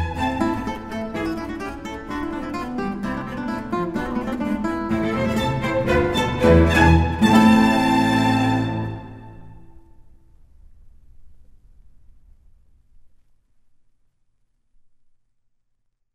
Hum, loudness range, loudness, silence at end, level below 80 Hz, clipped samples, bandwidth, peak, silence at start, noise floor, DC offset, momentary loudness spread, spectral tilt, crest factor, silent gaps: none; 11 LU; -20 LUFS; 3.1 s; -34 dBFS; under 0.1%; 15.5 kHz; -2 dBFS; 0 s; -69 dBFS; under 0.1%; 15 LU; -6.5 dB/octave; 20 dB; none